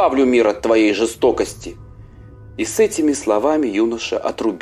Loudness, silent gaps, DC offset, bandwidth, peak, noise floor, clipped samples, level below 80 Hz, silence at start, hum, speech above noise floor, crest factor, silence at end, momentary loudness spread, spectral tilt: -17 LUFS; none; under 0.1%; 15 kHz; -2 dBFS; -39 dBFS; under 0.1%; -44 dBFS; 0 s; none; 23 dB; 14 dB; 0 s; 10 LU; -4 dB/octave